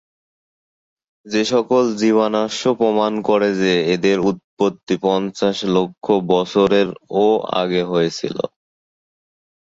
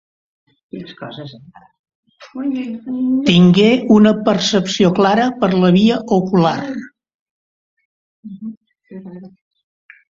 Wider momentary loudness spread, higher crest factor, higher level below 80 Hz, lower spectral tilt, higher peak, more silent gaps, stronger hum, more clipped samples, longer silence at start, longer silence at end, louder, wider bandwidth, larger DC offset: second, 5 LU vs 23 LU; about the same, 16 dB vs 16 dB; about the same, -58 dBFS vs -54 dBFS; about the same, -5.5 dB/octave vs -6.5 dB/octave; about the same, -2 dBFS vs 0 dBFS; second, 4.44-4.57 s, 4.83-4.87 s vs 1.79-1.84 s, 1.95-2.03 s, 7.15-7.77 s, 7.85-8.23 s, 8.57-8.61 s; neither; neither; first, 1.25 s vs 0.75 s; first, 1.15 s vs 0.8 s; second, -18 LUFS vs -14 LUFS; about the same, 8 kHz vs 7.6 kHz; neither